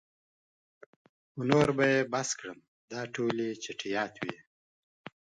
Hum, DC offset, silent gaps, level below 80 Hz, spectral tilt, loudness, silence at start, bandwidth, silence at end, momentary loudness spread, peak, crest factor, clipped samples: none; under 0.1%; 2.68-2.88 s; -68 dBFS; -4.5 dB/octave; -31 LUFS; 1.35 s; 11 kHz; 0.95 s; 21 LU; -6 dBFS; 28 dB; under 0.1%